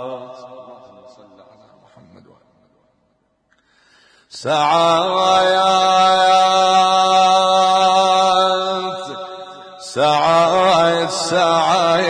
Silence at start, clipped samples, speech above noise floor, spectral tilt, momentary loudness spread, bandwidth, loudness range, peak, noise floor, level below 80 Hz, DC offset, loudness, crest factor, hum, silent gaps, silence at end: 0 s; under 0.1%; 48 dB; -3 dB/octave; 17 LU; 10.5 kHz; 7 LU; -4 dBFS; -64 dBFS; -60 dBFS; under 0.1%; -14 LUFS; 12 dB; none; none; 0 s